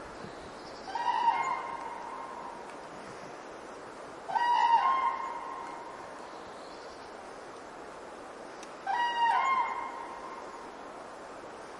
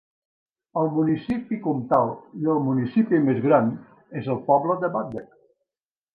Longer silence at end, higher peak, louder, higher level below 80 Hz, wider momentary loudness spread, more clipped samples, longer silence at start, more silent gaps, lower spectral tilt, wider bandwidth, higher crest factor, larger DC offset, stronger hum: second, 0 s vs 0.9 s; second, -14 dBFS vs -4 dBFS; second, -31 LUFS vs -23 LUFS; second, -68 dBFS vs -62 dBFS; first, 18 LU vs 12 LU; neither; second, 0 s vs 0.75 s; neither; second, -2.5 dB/octave vs -10.5 dB/octave; first, 11.5 kHz vs 4.9 kHz; about the same, 20 dB vs 20 dB; neither; neither